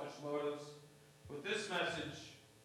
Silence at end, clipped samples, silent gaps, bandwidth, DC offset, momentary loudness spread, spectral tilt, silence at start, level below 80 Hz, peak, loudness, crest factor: 0 s; under 0.1%; none; 15.5 kHz; under 0.1%; 20 LU; -3.5 dB/octave; 0 s; -76 dBFS; -26 dBFS; -42 LUFS; 18 dB